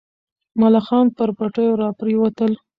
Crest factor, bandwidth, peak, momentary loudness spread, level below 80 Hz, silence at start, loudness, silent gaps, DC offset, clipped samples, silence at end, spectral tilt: 14 dB; 5.2 kHz; -4 dBFS; 6 LU; -60 dBFS; 0.55 s; -18 LUFS; none; under 0.1%; under 0.1%; 0.25 s; -9.5 dB/octave